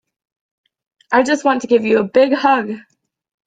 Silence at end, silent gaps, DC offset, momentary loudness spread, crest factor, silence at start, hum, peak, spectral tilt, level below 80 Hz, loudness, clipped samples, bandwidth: 0.65 s; none; under 0.1%; 6 LU; 16 dB; 1.1 s; none; -2 dBFS; -4.5 dB/octave; -60 dBFS; -15 LUFS; under 0.1%; 9.2 kHz